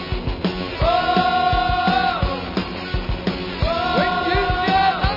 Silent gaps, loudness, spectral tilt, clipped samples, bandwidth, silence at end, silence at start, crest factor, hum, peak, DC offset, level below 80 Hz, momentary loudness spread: none; -20 LUFS; -7 dB/octave; under 0.1%; 5.8 kHz; 0 s; 0 s; 14 dB; none; -4 dBFS; under 0.1%; -30 dBFS; 8 LU